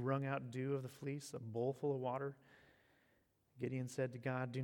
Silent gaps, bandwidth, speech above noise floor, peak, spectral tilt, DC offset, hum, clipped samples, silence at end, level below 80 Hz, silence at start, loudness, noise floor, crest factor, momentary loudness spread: none; 18 kHz; 35 dB; -26 dBFS; -7 dB/octave; under 0.1%; none; under 0.1%; 0 s; -84 dBFS; 0 s; -43 LUFS; -77 dBFS; 16 dB; 7 LU